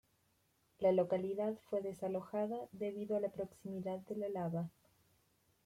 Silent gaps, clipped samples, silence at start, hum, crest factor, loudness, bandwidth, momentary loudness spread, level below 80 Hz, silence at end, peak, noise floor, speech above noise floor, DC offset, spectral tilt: none; under 0.1%; 0.8 s; none; 18 dB; -40 LUFS; 16 kHz; 9 LU; -78 dBFS; 0.95 s; -22 dBFS; -77 dBFS; 38 dB; under 0.1%; -8.5 dB/octave